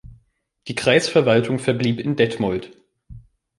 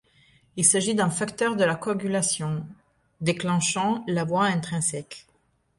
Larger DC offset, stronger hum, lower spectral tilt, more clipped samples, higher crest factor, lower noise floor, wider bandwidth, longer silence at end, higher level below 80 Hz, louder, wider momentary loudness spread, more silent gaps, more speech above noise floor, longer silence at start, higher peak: neither; neither; first, -5.5 dB/octave vs -4 dB/octave; neither; about the same, 18 dB vs 20 dB; second, -61 dBFS vs -67 dBFS; about the same, 11.5 kHz vs 11.5 kHz; second, 0.4 s vs 0.6 s; first, -52 dBFS vs -62 dBFS; first, -19 LUFS vs -24 LUFS; about the same, 12 LU vs 14 LU; neither; about the same, 42 dB vs 42 dB; second, 0.05 s vs 0.55 s; first, -2 dBFS vs -6 dBFS